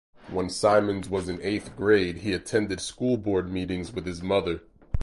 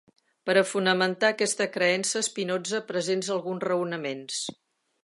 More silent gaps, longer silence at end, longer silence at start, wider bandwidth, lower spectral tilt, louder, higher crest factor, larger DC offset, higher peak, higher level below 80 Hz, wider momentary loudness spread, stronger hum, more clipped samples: neither; second, 0 s vs 0.5 s; second, 0.2 s vs 0.45 s; about the same, 11.5 kHz vs 11.5 kHz; first, -5.5 dB/octave vs -3 dB/octave; about the same, -27 LUFS vs -26 LUFS; about the same, 18 dB vs 20 dB; neither; about the same, -8 dBFS vs -8 dBFS; first, -44 dBFS vs -80 dBFS; about the same, 11 LU vs 9 LU; neither; neither